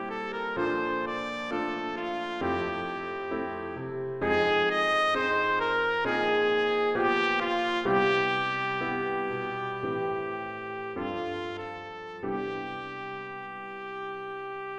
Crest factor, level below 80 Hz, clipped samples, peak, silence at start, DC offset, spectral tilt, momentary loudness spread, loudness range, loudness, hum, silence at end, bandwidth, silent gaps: 16 dB; -62 dBFS; under 0.1%; -14 dBFS; 0 s; under 0.1%; -5.5 dB/octave; 12 LU; 10 LU; -29 LUFS; none; 0 s; 9.2 kHz; none